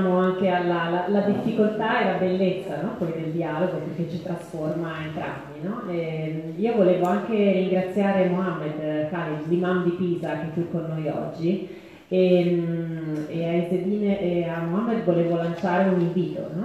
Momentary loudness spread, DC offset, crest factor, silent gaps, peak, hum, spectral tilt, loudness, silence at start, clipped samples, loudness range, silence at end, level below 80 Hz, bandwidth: 9 LU; under 0.1%; 16 dB; none; -8 dBFS; none; -8.5 dB/octave; -24 LUFS; 0 s; under 0.1%; 5 LU; 0 s; -62 dBFS; 11.5 kHz